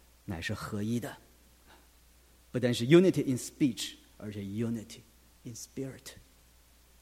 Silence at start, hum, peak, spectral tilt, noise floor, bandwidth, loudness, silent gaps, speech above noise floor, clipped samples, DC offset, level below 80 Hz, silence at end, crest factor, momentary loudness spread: 0.3 s; none; -8 dBFS; -6 dB/octave; -61 dBFS; 16 kHz; -31 LUFS; none; 31 dB; under 0.1%; under 0.1%; -62 dBFS; 0.85 s; 24 dB; 25 LU